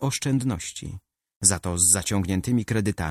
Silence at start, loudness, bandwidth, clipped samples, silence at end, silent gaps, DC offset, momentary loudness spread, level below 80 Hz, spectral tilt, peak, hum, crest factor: 0 s; -22 LUFS; 15.5 kHz; under 0.1%; 0 s; 1.36-1.41 s; under 0.1%; 14 LU; -46 dBFS; -4 dB/octave; -2 dBFS; none; 22 dB